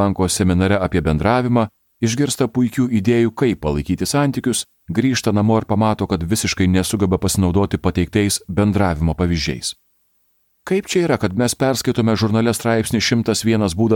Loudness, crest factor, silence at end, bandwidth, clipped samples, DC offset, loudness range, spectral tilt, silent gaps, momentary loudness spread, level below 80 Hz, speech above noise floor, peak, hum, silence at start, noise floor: -18 LUFS; 16 dB; 0 s; 18 kHz; under 0.1%; under 0.1%; 2 LU; -5.5 dB/octave; none; 5 LU; -38 dBFS; 46 dB; -2 dBFS; none; 0 s; -63 dBFS